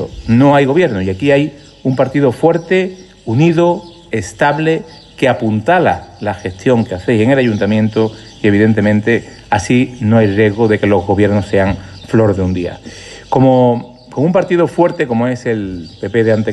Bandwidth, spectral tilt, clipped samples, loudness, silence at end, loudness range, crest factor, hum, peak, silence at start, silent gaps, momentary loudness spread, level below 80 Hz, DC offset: 11.5 kHz; -7 dB/octave; under 0.1%; -13 LUFS; 0 s; 2 LU; 12 dB; none; 0 dBFS; 0 s; none; 11 LU; -42 dBFS; under 0.1%